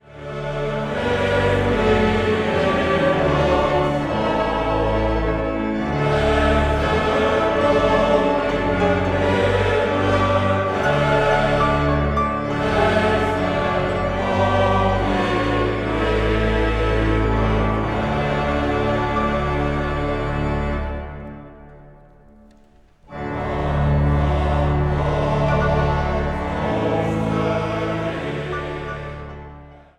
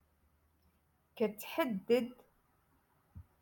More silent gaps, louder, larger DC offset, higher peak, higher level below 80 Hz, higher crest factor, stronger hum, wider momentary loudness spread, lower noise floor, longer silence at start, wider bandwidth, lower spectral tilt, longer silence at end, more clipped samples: neither; first, -20 LUFS vs -36 LUFS; neither; first, -4 dBFS vs -18 dBFS; first, -28 dBFS vs -72 dBFS; second, 14 dB vs 22 dB; neither; first, 8 LU vs 5 LU; second, -51 dBFS vs -74 dBFS; second, 0.05 s vs 1.15 s; second, 11.5 kHz vs 17.5 kHz; first, -7 dB/octave vs -5.5 dB/octave; about the same, 0.2 s vs 0.2 s; neither